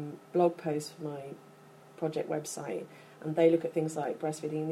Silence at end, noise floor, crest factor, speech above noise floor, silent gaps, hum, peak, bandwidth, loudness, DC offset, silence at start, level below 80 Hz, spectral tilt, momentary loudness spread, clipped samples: 0 s; -55 dBFS; 20 dB; 23 dB; none; none; -14 dBFS; 14 kHz; -32 LUFS; under 0.1%; 0 s; -82 dBFS; -6 dB/octave; 16 LU; under 0.1%